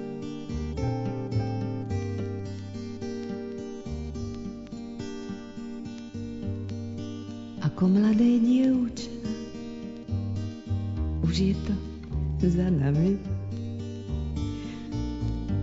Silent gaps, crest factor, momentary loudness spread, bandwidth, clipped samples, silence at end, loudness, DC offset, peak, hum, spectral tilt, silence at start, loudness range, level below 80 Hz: none; 16 dB; 15 LU; 7.8 kHz; under 0.1%; 0 s; -30 LUFS; under 0.1%; -12 dBFS; none; -8 dB/octave; 0 s; 11 LU; -40 dBFS